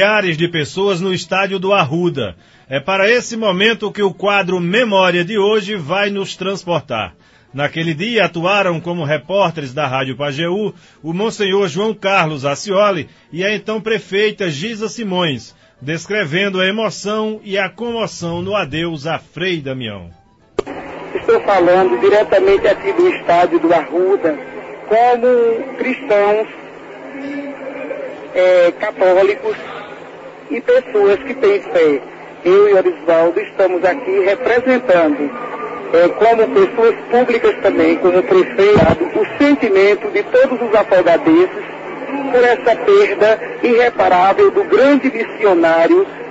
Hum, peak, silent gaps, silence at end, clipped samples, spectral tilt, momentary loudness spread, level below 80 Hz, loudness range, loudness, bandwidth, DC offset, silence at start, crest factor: none; 0 dBFS; none; 0 s; under 0.1%; -5.5 dB/octave; 14 LU; -50 dBFS; 6 LU; -14 LUFS; 8 kHz; under 0.1%; 0 s; 14 dB